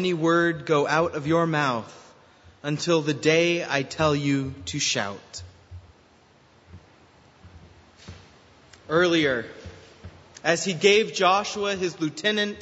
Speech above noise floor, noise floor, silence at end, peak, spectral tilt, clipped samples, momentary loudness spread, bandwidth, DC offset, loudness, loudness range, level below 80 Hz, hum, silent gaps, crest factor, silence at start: 33 dB; -57 dBFS; 0 s; -4 dBFS; -4 dB/octave; under 0.1%; 15 LU; 8 kHz; under 0.1%; -23 LUFS; 8 LU; -58 dBFS; none; none; 22 dB; 0 s